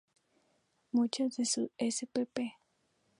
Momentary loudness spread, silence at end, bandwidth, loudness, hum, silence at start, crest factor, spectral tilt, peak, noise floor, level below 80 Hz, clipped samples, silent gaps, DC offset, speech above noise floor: 6 LU; 0.7 s; 11.5 kHz; -34 LUFS; none; 0.95 s; 20 dB; -3 dB/octave; -16 dBFS; -76 dBFS; -84 dBFS; under 0.1%; none; under 0.1%; 42 dB